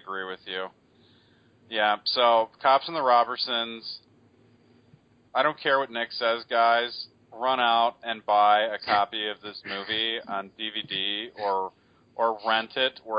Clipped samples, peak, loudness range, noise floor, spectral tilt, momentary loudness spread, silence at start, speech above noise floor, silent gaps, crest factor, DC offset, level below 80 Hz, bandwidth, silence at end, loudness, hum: under 0.1%; -8 dBFS; 4 LU; -60 dBFS; -6 dB/octave; 13 LU; 0.05 s; 34 dB; none; 18 dB; under 0.1%; -72 dBFS; 5.2 kHz; 0 s; -25 LUFS; none